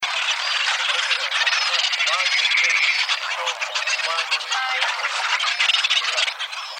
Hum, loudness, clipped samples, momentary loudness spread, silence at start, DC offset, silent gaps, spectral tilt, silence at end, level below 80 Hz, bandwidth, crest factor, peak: none; -19 LUFS; under 0.1%; 6 LU; 0 s; under 0.1%; none; 6 dB/octave; 0 s; -90 dBFS; 17 kHz; 16 dB; -6 dBFS